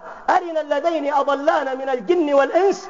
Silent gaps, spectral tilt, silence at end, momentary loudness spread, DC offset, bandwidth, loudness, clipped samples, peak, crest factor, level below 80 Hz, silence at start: none; -2 dB/octave; 0 s; 6 LU; 0.2%; 7.6 kHz; -19 LUFS; under 0.1%; -4 dBFS; 16 dB; -64 dBFS; 0 s